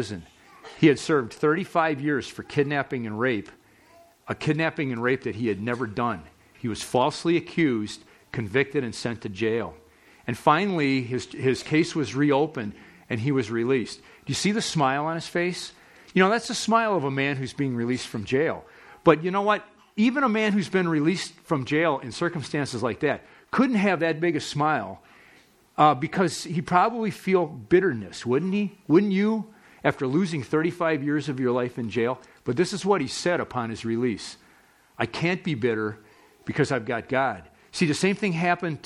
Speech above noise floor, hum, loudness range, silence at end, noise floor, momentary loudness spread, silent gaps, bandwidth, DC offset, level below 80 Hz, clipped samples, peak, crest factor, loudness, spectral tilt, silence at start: 33 dB; none; 4 LU; 0.05 s; -58 dBFS; 11 LU; none; 13.5 kHz; under 0.1%; -62 dBFS; under 0.1%; -2 dBFS; 24 dB; -25 LUFS; -5.5 dB/octave; 0 s